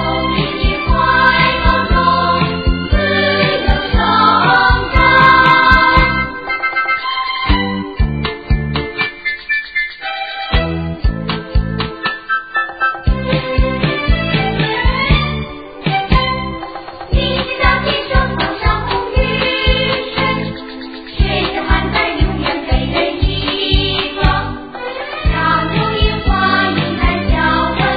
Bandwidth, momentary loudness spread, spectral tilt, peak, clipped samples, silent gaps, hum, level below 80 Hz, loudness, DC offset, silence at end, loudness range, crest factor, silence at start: 5 kHz; 10 LU; -8 dB/octave; 0 dBFS; under 0.1%; none; none; -20 dBFS; -14 LUFS; 0.4%; 0 s; 8 LU; 14 dB; 0 s